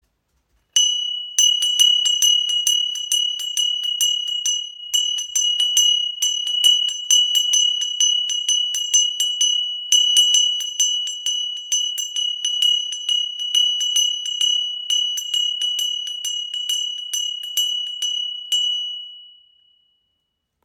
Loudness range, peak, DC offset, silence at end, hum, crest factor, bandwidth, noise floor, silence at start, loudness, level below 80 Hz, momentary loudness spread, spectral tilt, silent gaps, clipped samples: 6 LU; -2 dBFS; under 0.1%; 1.35 s; none; 20 dB; 17 kHz; -74 dBFS; 0.75 s; -17 LUFS; -76 dBFS; 8 LU; 8 dB/octave; none; under 0.1%